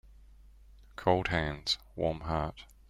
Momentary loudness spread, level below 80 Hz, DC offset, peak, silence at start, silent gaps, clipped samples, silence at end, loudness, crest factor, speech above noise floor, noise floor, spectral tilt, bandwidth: 7 LU; -48 dBFS; under 0.1%; -12 dBFS; 0.1 s; none; under 0.1%; 0.25 s; -32 LUFS; 22 dB; 24 dB; -56 dBFS; -5 dB/octave; 15.5 kHz